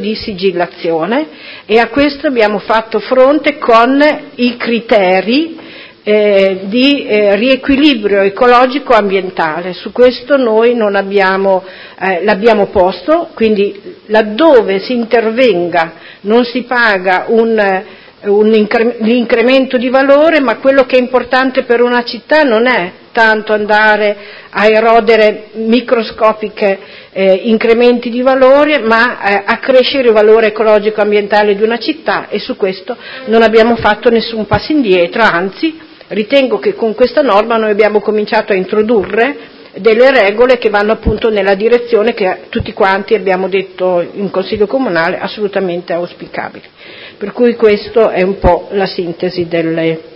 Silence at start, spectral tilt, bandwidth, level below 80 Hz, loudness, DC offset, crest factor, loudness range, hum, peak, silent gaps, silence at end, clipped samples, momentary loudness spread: 0 s; -6.5 dB/octave; 8 kHz; -38 dBFS; -10 LUFS; under 0.1%; 10 dB; 4 LU; none; 0 dBFS; none; 0.15 s; 0.6%; 9 LU